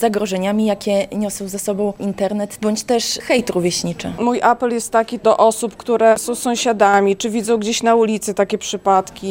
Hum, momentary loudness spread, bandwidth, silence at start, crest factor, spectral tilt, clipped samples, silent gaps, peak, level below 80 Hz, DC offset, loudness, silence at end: none; 7 LU; 17 kHz; 0 s; 16 dB; -4 dB/octave; under 0.1%; none; -2 dBFS; -52 dBFS; under 0.1%; -17 LUFS; 0 s